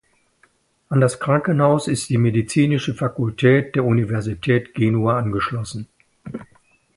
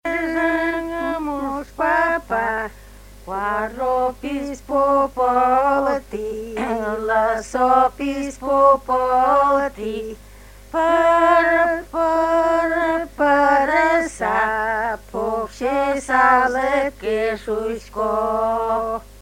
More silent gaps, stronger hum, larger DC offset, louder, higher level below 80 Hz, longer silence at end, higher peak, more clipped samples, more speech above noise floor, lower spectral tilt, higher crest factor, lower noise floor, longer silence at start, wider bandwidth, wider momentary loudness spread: neither; second, none vs 50 Hz at -50 dBFS; neither; about the same, -19 LUFS vs -19 LUFS; second, -50 dBFS vs -44 dBFS; first, 0.5 s vs 0.15 s; about the same, -2 dBFS vs -2 dBFS; neither; first, 42 dB vs 24 dB; first, -6.5 dB/octave vs -4.5 dB/octave; about the same, 18 dB vs 18 dB; first, -60 dBFS vs -42 dBFS; first, 0.9 s vs 0.05 s; second, 11.5 kHz vs 16.5 kHz; first, 16 LU vs 11 LU